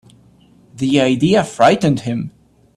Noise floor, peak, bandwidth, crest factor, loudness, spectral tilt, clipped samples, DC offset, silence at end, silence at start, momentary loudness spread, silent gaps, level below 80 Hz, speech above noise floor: -49 dBFS; 0 dBFS; 12.5 kHz; 16 dB; -15 LUFS; -6 dB/octave; under 0.1%; under 0.1%; 0.5 s; 0.75 s; 11 LU; none; -50 dBFS; 35 dB